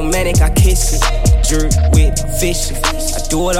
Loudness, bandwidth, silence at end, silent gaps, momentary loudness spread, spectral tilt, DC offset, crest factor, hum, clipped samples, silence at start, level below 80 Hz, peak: -14 LUFS; 16.5 kHz; 0 s; none; 5 LU; -4.5 dB/octave; under 0.1%; 12 dB; none; under 0.1%; 0 s; -14 dBFS; 0 dBFS